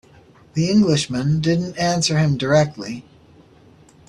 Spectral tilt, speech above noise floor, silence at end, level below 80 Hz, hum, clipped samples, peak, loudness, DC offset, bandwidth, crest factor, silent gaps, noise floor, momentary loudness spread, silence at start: -5.5 dB/octave; 31 dB; 1.05 s; -50 dBFS; none; under 0.1%; -4 dBFS; -19 LUFS; under 0.1%; 11 kHz; 16 dB; none; -49 dBFS; 13 LU; 0.55 s